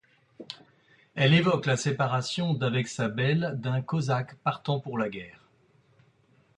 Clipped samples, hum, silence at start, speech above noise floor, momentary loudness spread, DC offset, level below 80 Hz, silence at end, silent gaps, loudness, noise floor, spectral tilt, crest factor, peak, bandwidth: under 0.1%; none; 0.4 s; 37 dB; 20 LU; under 0.1%; -64 dBFS; 1.25 s; none; -27 LUFS; -64 dBFS; -5.5 dB/octave; 20 dB; -10 dBFS; 10.5 kHz